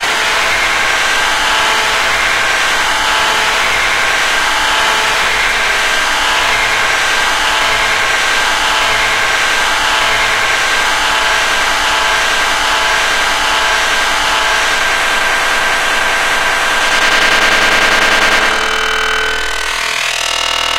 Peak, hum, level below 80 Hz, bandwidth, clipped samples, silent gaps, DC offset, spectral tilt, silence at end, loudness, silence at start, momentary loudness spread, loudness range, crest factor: 0 dBFS; none; -32 dBFS; 17 kHz; under 0.1%; none; under 0.1%; 0 dB/octave; 0 s; -11 LUFS; 0 s; 3 LU; 1 LU; 12 dB